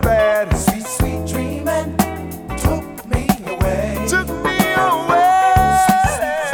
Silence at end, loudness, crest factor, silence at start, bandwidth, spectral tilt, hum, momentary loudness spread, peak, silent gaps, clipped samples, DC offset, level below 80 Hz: 0 s; -17 LUFS; 16 dB; 0 s; over 20 kHz; -5 dB/octave; none; 9 LU; 0 dBFS; none; under 0.1%; under 0.1%; -28 dBFS